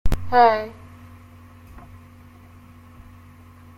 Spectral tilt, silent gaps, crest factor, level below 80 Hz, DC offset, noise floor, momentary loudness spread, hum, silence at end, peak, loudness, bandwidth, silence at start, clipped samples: -6 dB/octave; none; 20 dB; -34 dBFS; under 0.1%; -46 dBFS; 29 LU; none; 2 s; -4 dBFS; -18 LUFS; 16.5 kHz; 0.05 s; under 0.1%